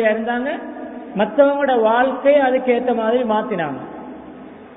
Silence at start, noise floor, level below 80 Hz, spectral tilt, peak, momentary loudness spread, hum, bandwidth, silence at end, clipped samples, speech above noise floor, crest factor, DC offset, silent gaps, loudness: 0 s; -37 dBFS; -58 dBFS; -10.5 dB/octave; -2 dBFS; 19 LU; none; 4 kHz; 0 s; under 0.1%; 20 dB; 16 dB; under 0.1%; none; -18 LUFS